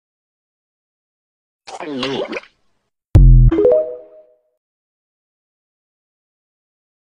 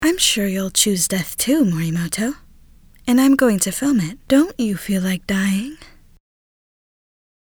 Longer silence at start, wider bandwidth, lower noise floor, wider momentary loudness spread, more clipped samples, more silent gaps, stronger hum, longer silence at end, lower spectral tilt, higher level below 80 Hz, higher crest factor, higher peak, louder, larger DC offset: first, 1.7 s vs 0 s; second, 6.8 kHz vs over 20 kHz; first, -66 dBFS vs -47 dBFS; first, 20 LU vs 8 LU; neither; neither; neither; first, 3.2 s vs 1.65 s; first, -8 dB/octave vs -4 dB/octave; first, -20 dBFS vs -46 dBFS; about the same, 18 dB vs 20 dB; about the same, 0 dBFS vs 0 dBFS; first, -14 LUFS vs -18 LUFS; neither